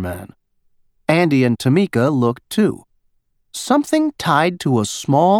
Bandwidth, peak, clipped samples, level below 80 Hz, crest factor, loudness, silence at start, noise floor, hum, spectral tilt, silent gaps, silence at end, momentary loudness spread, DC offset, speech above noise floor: 17.5 kHz; 0 dBFS; under 0.1%; -54 dBFS; 16 dB; -17 LUFS; 0 s; -63 dBFS; none; -6 dB/octave; none; 0 s; 13 LU; under 0.1%; 47 dB